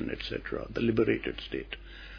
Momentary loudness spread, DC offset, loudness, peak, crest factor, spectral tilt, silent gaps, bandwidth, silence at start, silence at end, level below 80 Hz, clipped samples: 12 LU; under 0.1%; -32 LUFS; -12 dBFS; 20 dB; -7.5 dB/octave; none; 5.4 kHz; 0 s; 0 s; -48 dBFS; under 0.1%